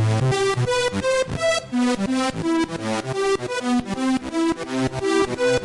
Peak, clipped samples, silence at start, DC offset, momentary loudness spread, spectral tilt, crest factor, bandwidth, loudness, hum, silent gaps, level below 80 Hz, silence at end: -10 dBFS; under 0.1%; 0 s; under 0.1%; 3 LU; -5 dB/octave; 10 dB; 11.5 kHz; -22 LUFS; none; none; -48 dBFS; 0 s